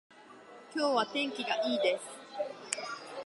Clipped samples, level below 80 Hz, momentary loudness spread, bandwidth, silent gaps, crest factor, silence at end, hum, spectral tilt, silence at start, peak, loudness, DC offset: under 0.1%; under -90 dBFS; 17 LU; 11.5 kHz; none; 26 dB; 0 s; none; -2 dB/octave; 0.1 s; -8 dBFS; -33 LUFS; under 0.1%